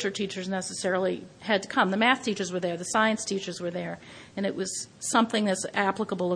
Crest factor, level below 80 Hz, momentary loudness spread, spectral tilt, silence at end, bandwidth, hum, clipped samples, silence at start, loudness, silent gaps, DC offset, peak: 22 dB; -70 dBFS; 10 LU; -3.5 dB/octave; 0 s; 10.5 kHz; none; under 0.1%; 0 s; -27 LUFS; none; under 0.1%; -6 dBFS